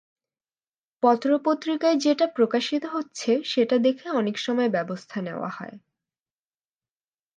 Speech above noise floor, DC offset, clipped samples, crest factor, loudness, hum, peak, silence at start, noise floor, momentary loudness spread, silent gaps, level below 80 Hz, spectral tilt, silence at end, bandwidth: over 66 dB; under 0.1%; under 0.1%; 18 dB; -24 LUFS; none; -6 dBFS; 1.05 s; under -90 dBFS; 11 LU; none; -80 dBFS; -5 dB/octave; 1.6 s; 9.4 kHz